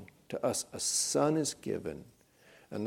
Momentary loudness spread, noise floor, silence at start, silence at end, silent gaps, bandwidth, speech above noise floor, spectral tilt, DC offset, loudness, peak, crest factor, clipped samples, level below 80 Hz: 15 LU; -61 dBFS; 0 s; 0 s; none; 17 kHz; 29 dB; -3.5 dB/octave; under 0.1%; -32 LUFS; -14 dBFS; 20 dB; under 0.1%; -70 dBFS